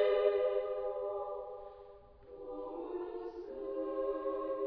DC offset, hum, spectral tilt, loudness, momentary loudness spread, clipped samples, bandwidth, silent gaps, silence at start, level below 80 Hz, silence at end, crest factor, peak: under 0.1%; none; -3 dB/octave; -38 LUFS; 20 LU; under 0.1%; 5.4 kHz; none; 0 s; -64 dBFS; 0 s; 18 dB; -18 dBFS